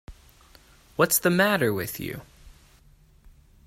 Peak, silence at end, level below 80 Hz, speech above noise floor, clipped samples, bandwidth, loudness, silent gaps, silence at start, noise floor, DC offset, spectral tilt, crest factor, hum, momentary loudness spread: -6 dBFS; 1.15 s; -54 dBFS; 33 dB; under 0.1%; 16 kHz; -23 LUFS; none; 0.1 s; -56 dBFS; under 0.1%; -4 dB/octave; 22 dB; none; 17 LU